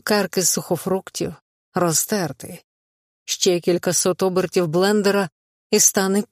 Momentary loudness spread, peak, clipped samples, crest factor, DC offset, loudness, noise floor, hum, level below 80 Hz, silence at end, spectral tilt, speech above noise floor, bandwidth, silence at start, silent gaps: 14 LU; -2 dBFS; under 0.1%; 18 dB; under 0.1%; -20 LUFS; under -90 dBFS; none; -62 dBFS; 0.05 s; -3.5 dB/octave; over 70 dB; 15.5 kHz; 0.05 s; 1.42-1.72 s, 2.64-3.26 s, 5.32-5.70 s